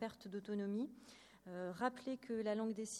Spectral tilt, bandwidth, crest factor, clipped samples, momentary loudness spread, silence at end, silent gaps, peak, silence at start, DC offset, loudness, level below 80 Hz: -5 dB/octave; 13.5 kHz; 20 dB; under 0.1%; 15 LU; 0 s; none; -24 dBFS; 0 s; under 0.1%; -44 LUFS; -80 dBFS